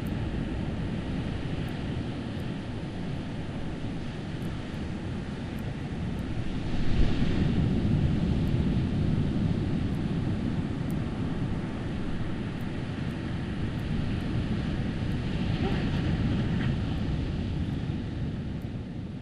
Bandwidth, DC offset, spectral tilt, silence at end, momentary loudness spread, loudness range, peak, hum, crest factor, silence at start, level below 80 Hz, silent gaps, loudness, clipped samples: 11.5 kHz; under 0.1%; -8 dB/octave; 0 s; 8 LU; 7 LU; -12 dBFS; none; 18 dB; 0 s; -36 dBFS; none; -31 LUFS; under 0.1%